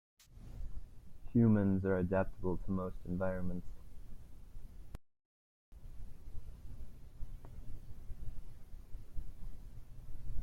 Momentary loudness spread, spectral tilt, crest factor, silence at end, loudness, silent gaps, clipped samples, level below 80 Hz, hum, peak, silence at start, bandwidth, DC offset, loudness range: 25 LU; -10 dB/octave; 18 dB; 0 s; -35 LUFS; 5.25-5.72 s; under 0.1%; -48 dBFS; none; -20 dBFS; 0.3 s; 6.8 kHz; under 0.1%; 21 LU